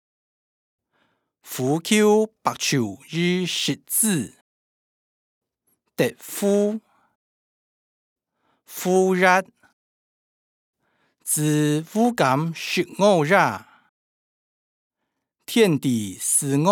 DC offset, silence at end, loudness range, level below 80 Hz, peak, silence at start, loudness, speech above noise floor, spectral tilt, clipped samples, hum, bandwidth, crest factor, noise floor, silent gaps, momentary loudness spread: under 0.1%; 0 s; 7 LU; -76 dBFS; -4 dBFS; 1.45 s; -21 LUFS; 60 dB; -4 dB/octave; under 0.1%; none; over 20 kHz; 20 dB; -80 dBFS; 4.41-5.41 s, 7.15-8.16 s, 9.73-10.73 s, 13.89-14.90 s; 10 LU